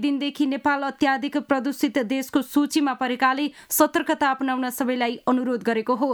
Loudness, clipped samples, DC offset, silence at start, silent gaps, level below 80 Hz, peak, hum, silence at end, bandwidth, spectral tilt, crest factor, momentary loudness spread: -23 LUFS; under 0.1%; under 0.1%; 0 s; none; -64 dBFS; -4 dBFS; none; 0 s; over 20 kHz; -3 dB/octave; 20 dB; 4 LU